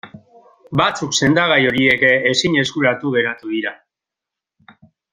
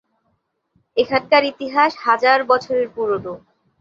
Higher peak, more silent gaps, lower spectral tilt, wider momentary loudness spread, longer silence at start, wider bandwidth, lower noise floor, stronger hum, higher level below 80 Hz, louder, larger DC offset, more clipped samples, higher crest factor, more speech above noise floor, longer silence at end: about the same, 0 dBFS vs -2 dBFS; neither; about the same, -4 dB/octave vs -5 dB/octave; about the same, 10 LU vs 10 LU; second, 0.05 s vs 0.95 s; first, 11 kHz vs 7.6 kHz; first, -85 dBFS vs -69 dBFS; neither; first, -54 dBFS vs -60 dBFS; about the same, -16 LUFS vs -18 LUFS; neither; neither; about the same, 18 dB vs 18 dB; first, 69 dB vs 51 dB; first, 1.4 s vs 0.45 s